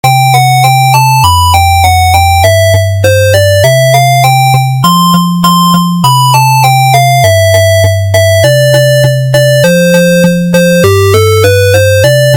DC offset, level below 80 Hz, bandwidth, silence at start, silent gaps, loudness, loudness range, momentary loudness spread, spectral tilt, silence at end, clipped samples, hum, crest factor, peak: under 0.1%; -34 dBFS; 17.5 kHz; 0.05 s; none; -6 LUFS; 0 LU; 2 LU; -5 dB/octave; 0 s; 0.3%; none; 6 dB; 0 dBFS